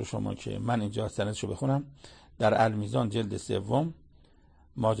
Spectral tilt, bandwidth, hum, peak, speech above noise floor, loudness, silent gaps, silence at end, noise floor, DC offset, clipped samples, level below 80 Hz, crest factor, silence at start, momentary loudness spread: -6.5 dB/octave; 9.8 kHz; none; -12 dBFS; 29 dB; -30 LUFS; none; 0 s; -59 dBFS; under 0.1%; under 0.1%; -56 dBFS; 18 dB; 0 s; 8 LU